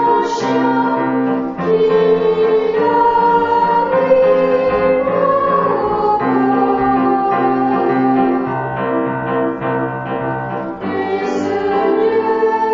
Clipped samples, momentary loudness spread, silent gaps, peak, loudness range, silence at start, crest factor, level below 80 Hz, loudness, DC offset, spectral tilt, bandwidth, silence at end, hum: under 0.1%; 7 LU; none; 0 dBFS; 5 LU; 0 s; 14 dB; -48 dBFS; -15 LUFS; under 0.1%; -7 dB/octave; 7.6 kHz; 0 s; none